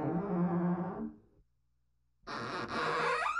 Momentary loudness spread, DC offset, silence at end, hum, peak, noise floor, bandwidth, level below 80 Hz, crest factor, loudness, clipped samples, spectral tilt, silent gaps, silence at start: 13 LU; under 0.1%; 0 s; 60 Hz at -60 dBFS; -22 dBFS; -79 dBFS; 10.5 kHz; -66 dBFS; 14 dB; -35 LUFS; under 0.1%; -6.5 dB/octave; none; 0 s